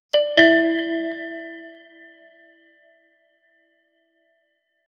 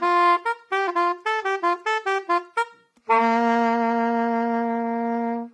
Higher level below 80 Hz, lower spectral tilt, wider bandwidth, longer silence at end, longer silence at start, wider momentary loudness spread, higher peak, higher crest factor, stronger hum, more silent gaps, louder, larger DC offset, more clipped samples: first, -66 dBFS vs -86 dBFS; about the same, -4 dB/octave vs -4.5 dB/octave; second, 6.8 kHz vs 10 kHz; first, 3.25 s vs 0.05 s; first, 0.15 s vs 0 s; first, 24 LU vs 6 LU; first, 0 dBFS vs -6 dBFS; first, 24 dB vs 16 dB; neither; neither; first, -18 LUFS vs -23 LUFS; neither; neither